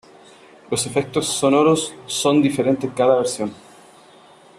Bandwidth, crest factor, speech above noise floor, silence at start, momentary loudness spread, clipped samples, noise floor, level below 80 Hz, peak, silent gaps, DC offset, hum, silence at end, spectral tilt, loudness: 14 kHz; 18 dB; 29 dB; 0.7 s; 9 LU; under 0.1%; -48 dBFS; -60 dBFS; -4 dBFS; none; under 0.1%; none; 1.05 s; -4.5 dB/octave; -19 LUFS